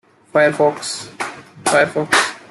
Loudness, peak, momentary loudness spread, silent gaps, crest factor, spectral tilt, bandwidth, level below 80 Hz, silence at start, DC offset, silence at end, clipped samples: -17 LUFS; -2 dBFS; 12 LU; none; 16 dB; -3 dB/octave; 13 kHz; -62 dBFS; 0.35 s; under 0.1%; 0.1 s; under 0.1%